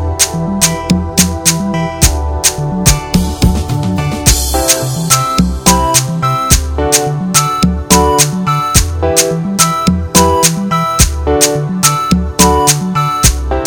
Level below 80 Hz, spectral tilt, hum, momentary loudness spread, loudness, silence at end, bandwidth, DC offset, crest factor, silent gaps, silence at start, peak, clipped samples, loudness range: -20 dBFS; -3.5 dB/octave; none; 4 LU; -11 LUFS; 0 s; over 20 kHz; under 0.1%; 12 dB; none; 0 s; 0 dBFS; 1%; 2 LU